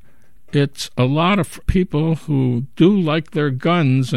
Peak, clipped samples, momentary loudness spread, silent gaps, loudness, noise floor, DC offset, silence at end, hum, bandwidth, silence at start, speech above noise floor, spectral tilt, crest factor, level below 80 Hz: -2 dBFS; under 0.1%; 5 LU; none; -18 LUFS; -53 dBFS; 1%; 0 s; none; 13 kHz; 0.55 s; 36 dB; -7 dB/octave; 14 dB; -36 dBFS